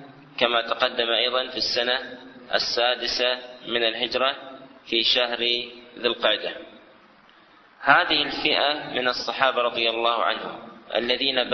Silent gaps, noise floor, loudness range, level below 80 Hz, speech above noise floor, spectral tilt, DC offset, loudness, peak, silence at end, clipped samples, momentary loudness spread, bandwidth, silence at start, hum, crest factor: none; -54 dBFS; 3 LU; -60 dBFS; 30 dB; -2.5 dB/octave; under 0.1%; -23 LUFS; -2 dBFS; 0 s; under 0.1%; 11 LU; 6.4 kHz; 0 s; none; 22 dB